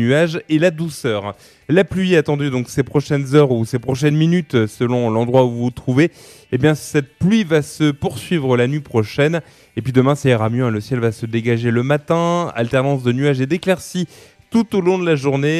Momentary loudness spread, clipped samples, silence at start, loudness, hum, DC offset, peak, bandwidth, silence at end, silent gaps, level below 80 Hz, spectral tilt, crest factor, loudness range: 6 LU; under 0.1%; 0 s; -17 LUFS; none; under 0.1%; -2 dBFS; 13.5 kHz; 0 s; none; -50 dBFS; -6.5 dB/octave; 16 dB; 2 LU